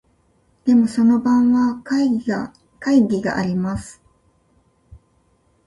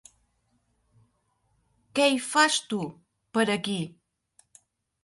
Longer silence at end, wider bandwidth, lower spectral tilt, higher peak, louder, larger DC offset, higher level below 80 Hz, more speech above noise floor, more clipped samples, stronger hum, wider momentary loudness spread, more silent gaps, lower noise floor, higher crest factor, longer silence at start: first, 1.75 s vs 1.15 s; about the same, 11.5 kHz vs 12 kHz; first, -7 dB/octave vs -3 dB/octave; about the same, -6 dBFS vs -8 dBFS; first, -18 LUFS vs -25 LUFS; neither; first, -50 dBFS vs -72 dBFS; about the same, 44 dB vs 47 dB; neither; neither; about the same, 12 LU vs 11 LU; neither; second, -61 dBFS vs -72 dBFS; second, 14 dB vs 22 dB; second, 0.65 s vs 1.95 s